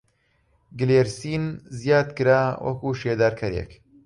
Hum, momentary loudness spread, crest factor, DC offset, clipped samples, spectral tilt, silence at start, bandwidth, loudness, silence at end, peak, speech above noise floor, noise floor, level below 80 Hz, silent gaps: none; 11 LU; 18 dB; under 0.1%; under 0.1%; -6.5 dB/octave; 0.75 s; 11.5 kHz; -23 LUFS; 0.3 s; -6 dBFS; 44 dB; -66 dBFS; -48 dBFS; none